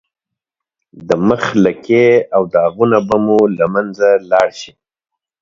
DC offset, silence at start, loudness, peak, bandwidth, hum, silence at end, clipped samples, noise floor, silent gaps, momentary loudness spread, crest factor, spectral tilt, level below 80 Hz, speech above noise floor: under 0.1%; 0.95 s; -13 LUFS; 0 dBFS; 7.6 kHz; none; 0.75 s; under 0.1%; -81 dBFS; none; 6 LU; 14 dB; -6.5 dB/octave; -52 dBFS; 68 dB